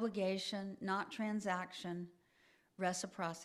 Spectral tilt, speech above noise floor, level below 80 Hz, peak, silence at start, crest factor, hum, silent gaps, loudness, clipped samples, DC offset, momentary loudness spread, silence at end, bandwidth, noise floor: -4.5 dB/octave; 31 dB; -82 dBFS; -24 dBFS; 0 s; 18 dB; none; none; -41 LUFS; under 0.1%; under 0.1%; 7 LU; 0 s; 13.5 kHz; -72 dBFS